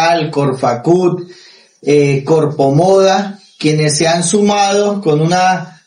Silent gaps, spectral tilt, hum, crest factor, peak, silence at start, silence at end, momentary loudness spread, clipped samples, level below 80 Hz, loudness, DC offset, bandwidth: none; -5 dB/octave; none; 12 dB; 0 dBFS; 0 s; 0.15 s; 7 LU; under 0.1%; -54 dBFS; -12 LUFS; under 0.1%; 11 kHz